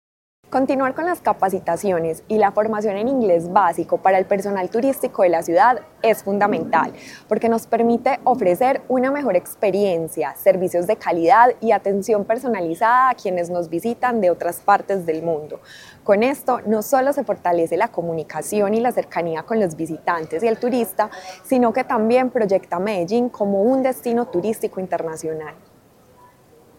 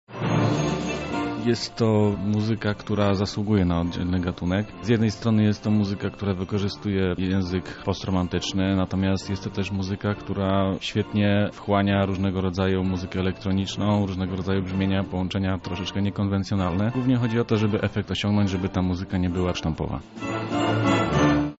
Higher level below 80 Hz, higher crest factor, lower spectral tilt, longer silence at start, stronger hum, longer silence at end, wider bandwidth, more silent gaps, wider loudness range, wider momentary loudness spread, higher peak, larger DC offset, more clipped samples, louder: second, -62 dBFS vs -46 dBFS; about the same, 18 dB vs 16 dB; about the same, -6 dB/octave vs -6 dB/octave; first, 0.5 s vs 0.1 s; neither; first, 1.25 s vs 0.05 s; first, 17 kHz vs 8 kHz; neither; about the same, 4 LU vs 2 LU; about the same, 8 LU vs 6 LU; first, 0 dBFS vs -8 dBFS; neither; neither; first, -19 LUFS vs -25 LUFS